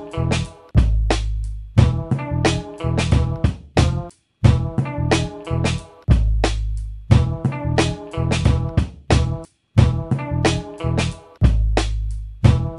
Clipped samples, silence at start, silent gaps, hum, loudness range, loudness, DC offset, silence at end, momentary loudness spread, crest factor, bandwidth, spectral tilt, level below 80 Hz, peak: under 0.1%; 0 s; none; none; 1 LU; -20 LUFS; under 0.1%; 0 s; 8 LU; 18 dB; 11.5 kHz; -6.5 dB/octave; -24 dBFS; 0 dBFS